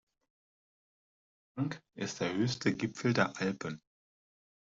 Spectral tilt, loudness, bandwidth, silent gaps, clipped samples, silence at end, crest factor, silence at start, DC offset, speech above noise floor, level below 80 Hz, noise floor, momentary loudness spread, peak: -5.5 dB/octave; -34 LUFS; 7.8 kHz; none; under 0.1%; 0.95 s; 22 dB; 1.55 s; under 0.1%; over 56 dB; -72 dBFS; under -90 dBFS; 11 LU; -14 dBFS